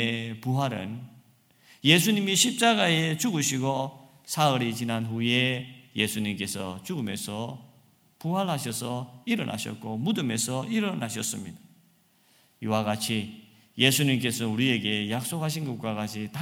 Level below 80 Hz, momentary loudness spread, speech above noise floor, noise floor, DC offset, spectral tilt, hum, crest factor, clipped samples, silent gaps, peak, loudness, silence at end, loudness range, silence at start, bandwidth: -68 dBFS; 14 LU; 36 dB; -63 dBFS; under 0.1%; -4 dB/octave; none; 26 dB; under 0.1%; none; -2 dBFS; -27 LUFS; 0 s; 7 LU; 0 s; 17 kHz